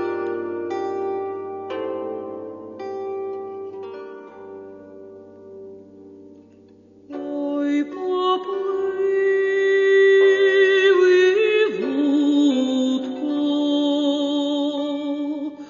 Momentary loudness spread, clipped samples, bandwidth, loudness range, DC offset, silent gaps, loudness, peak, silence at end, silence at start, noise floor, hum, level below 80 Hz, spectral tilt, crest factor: 22 LU; under 0.1%; 7.4 kHz; 19 LU; under 0.1%; none; -20 LUFS; -6 dBFS; 0 s; 0 s; -49 dBFS; none; -74 dBFS; -4 dB/octave; 14 dB